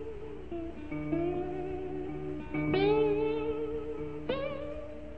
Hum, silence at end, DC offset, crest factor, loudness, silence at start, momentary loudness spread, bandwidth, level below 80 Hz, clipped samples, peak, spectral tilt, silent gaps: none; 0 s; 0.5%; 16 dB; -34 LUFS; 0 s; 13 LU; 5.6 kHz; -50 dBFS; under 0.1%; -16 dBFS; -8.5 dB/octave; none